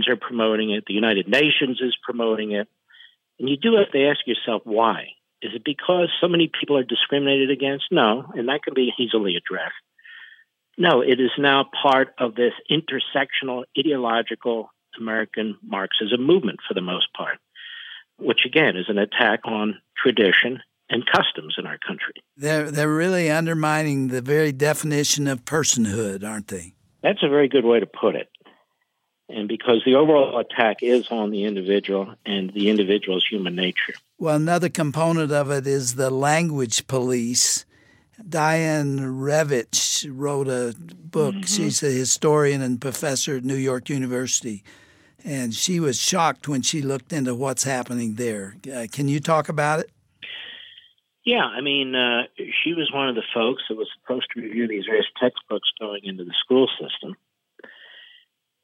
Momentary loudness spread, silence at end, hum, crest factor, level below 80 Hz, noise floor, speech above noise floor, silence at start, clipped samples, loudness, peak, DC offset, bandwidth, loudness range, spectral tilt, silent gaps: 12 LU; 0.65 s; none; 20 dB; -70 dBFS; -74 dBFS; 52 dB; 0 s; under 0.1%; -21 LUFS; -2 dBFS; under 0.1%; 16.5 kHz; 4 LU; -3.5 dB/octave; none